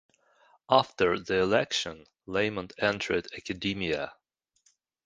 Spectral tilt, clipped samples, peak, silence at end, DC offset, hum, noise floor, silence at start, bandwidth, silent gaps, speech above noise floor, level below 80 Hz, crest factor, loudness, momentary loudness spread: -4 dB/octave; under 0.1%; -8 dBFS; 0.95 s; under 0.1%; none; -70 dBFS; 0.7 s; 9.8 kHz; none; 42 dB; -58 dBFS; 24 dB; -28 LUFS; 10 LU